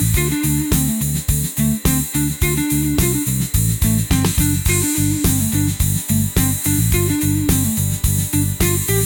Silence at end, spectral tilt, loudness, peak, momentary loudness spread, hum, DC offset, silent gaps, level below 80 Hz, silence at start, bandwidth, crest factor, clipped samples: 0 s; -4.5 dB/octave; -17 LUFS; -4 dBFS; 2 LU; none; under 0.1%; none; -26 dBFS; 0 s; 19.5 kHz; 14 dB; under 0.1%